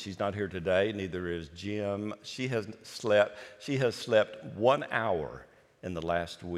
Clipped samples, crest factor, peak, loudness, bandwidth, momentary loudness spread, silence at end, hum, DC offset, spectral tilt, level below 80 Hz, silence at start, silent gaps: under 0.1%; 20 dB; -10 dBFS; -31 LUFS; 13.5 kHz; 12 LU; 0 s; none; under 0.1%; -5.5 dB/octave; -64 dBFS; 0 s; none